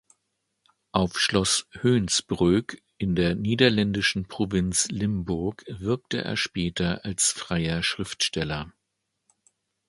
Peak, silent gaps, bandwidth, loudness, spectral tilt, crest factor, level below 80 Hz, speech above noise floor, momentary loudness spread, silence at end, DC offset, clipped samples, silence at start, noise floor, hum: -4 dBFS; none; 11.5 kHz; -25 LUFS; -4 dB/octave; 22 dB; -46 dBFS; 54 dB; 8 LU; 1.2 s; under 0.1%; under 0.1%; 0.95 s; -80 dBFS; none